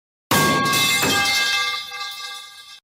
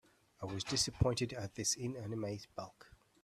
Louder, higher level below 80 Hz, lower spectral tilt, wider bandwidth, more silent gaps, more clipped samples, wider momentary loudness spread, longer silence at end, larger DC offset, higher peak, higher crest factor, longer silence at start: first, -18 LUFS vs -38 LUFS; about the same, -56 dBFS vs -56 dBFS; second, -2 dB/octave vs -4 dB/octave; first, 16.5 kHz vs 14.5 kHz; neither; neither; about the same, 15 LU vs 15 LU; second, 0.05 s vs 0.4 s; neither; first, -8 dBFS vs -18 dBFS; second, 14 dB vs 22 dB; about the same, 0.3 s vs 0.4 s